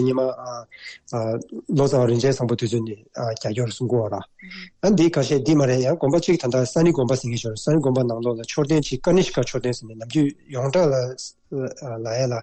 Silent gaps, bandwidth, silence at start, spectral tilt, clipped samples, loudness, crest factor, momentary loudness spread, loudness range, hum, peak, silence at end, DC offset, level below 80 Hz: none; 9 kHz; 0 s; -6.5 dB/octave; under 0.1%; -22 LUFS; 12 dB; 13 LU; 3 LU; none; -8 dBFS; 0 s; under 0.1%; -52 dBFS